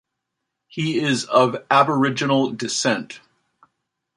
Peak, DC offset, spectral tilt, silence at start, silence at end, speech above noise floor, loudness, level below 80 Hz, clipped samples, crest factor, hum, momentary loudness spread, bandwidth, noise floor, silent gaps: -2 dBFS; under 0.1%; -4.5 dB/octave; 0.75 s; 1 s; 60 dB; -20 LUFS; -68 dBFS; under 0.1%; 20 dB; none; 12 LU; 11.5 kHz; -80 dBFS; none